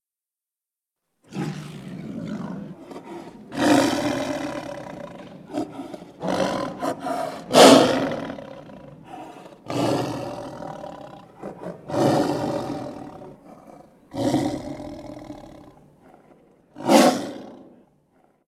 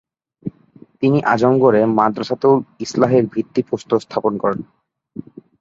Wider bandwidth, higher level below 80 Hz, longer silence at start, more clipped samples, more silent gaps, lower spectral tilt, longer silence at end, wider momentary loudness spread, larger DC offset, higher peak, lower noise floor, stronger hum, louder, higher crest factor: first, 16.5 kHz vs 7.8 kHz; about the same, -58 dBFS vs -58 dBFS; first, 1.3 s vs 0.45 s; neither; neither; second, -4.5 dB/octave vs -7 dB/octave; second, 0.8 s vs 1 s; first, 23 LU vs 19 LU; neither; about the same, 0 dBFS vs 0 dBFS; first, under -90 dBFS vs -47 dBFS; neither; second, -22 LUFS vs -17 LUFS; first, 24 dB vs 18 dB